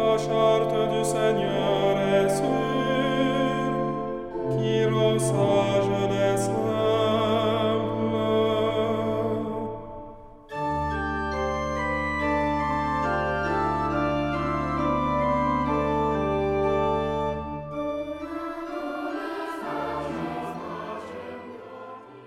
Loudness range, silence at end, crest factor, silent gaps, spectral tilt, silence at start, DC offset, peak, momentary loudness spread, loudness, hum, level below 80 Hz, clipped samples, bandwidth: 8 LU; 0 s; 16 dB; none; -6 dB/octave; 0 s; under 0.1%; -8 dBFS; 11 LU; -25 LUFS; none; -44 dBFS; under 0.1%; 16 kHz